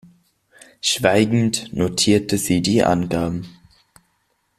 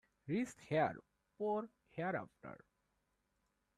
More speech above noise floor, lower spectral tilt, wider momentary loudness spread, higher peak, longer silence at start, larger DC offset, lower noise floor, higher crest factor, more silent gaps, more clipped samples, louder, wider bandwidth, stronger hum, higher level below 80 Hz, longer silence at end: first, 49 dB vs 43 dB; second, -4.5 dB/octave vs -6.5 dB/octave; second, 7 LU vs 19 LU; first, -2 dBFS vs -24 dBFS; first, 0.85 s vs 0.25 s; neither; second, -67 dBFS vs -83 dBFS; about the same, 18 dB vs 20 dB; neither; neither; first, -19 LUFS vs -41 LUFS; first, 15 kHz vs 13 kHz; neither; first, -50 dBFS vs -78 dBFS; about the same, 1.1 s vs 1.2 s